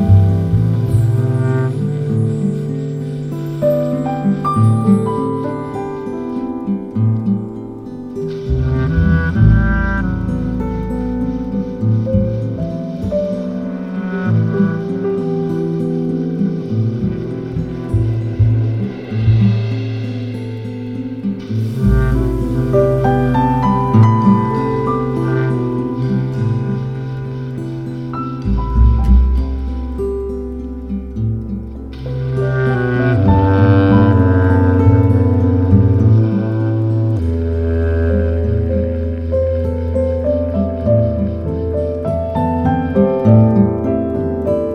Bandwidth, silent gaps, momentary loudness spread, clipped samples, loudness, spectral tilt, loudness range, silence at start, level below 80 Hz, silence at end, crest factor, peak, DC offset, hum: 5.8 kHz; none; 11 LU; under 0.1%; -16 LUFS; -10 dB/octave; 6 LU; 0 s; -24 dBFS; 0 s; 14 dB; 0 dBFS; under 0.1%; none